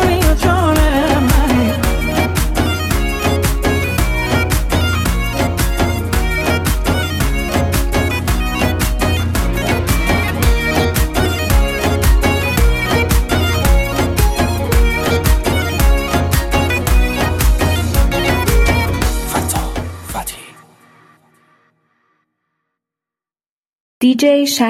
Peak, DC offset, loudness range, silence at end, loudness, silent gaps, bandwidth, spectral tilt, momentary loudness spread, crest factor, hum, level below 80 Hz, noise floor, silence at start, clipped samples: 0 dBFS; under 0.1%; 5 LU; 0 s; -15 LUFS; 23.49-24.01 s; 16.5 kHz; -5 dB/octave; 4 LU; 14 dB; none; -18 dBFS; under -90 dBFS; 0 s; under 0.1%